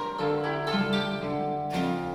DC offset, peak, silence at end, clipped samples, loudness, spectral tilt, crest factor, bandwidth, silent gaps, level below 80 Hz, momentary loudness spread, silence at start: under 0.1%; -16 dBFS; 0 s; under 0.1%; -28 LUFS; -6.5 dB/octave; 12 dB; 13.5 kHz; none; -58 dBFS; 4 LU; 0 s